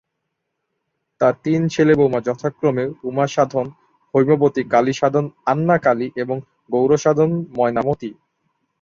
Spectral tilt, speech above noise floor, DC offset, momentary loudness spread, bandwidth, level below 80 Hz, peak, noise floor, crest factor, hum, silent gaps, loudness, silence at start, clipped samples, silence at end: -7 dB/octave; 59 dB; under 0.1%; 9 LU; 7.4 kHz; -56 dBFS; -2 dBFS; -76 dBFS; 16 dB; none; none; -19 LUFS; 1.2 s; under 0.1%; 0.7 s